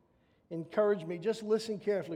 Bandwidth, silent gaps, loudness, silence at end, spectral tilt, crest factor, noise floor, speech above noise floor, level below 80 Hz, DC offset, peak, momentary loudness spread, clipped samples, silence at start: 12.5 kHz; none; -33 LUFS; 0 s; -6 dB/octave; 16 dB; -69 dBFS; 37 dB; -78 dBFS; under 0.1%; -18 dBFS; 9 LU; under 0.1%; 0.5 s